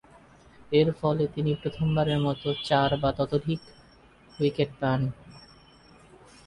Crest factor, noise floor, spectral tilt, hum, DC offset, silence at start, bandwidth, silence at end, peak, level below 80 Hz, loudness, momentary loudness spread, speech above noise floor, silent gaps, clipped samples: 18 dB; -55 dBFS; -7.5 dB/octave; none; under 0.1%; 0.7 s; 11 kHz; 1.05 s; -10 dBFS; -52 dBFS; -27 LUFS; 6 LU; 30 dB; none; under 0.1%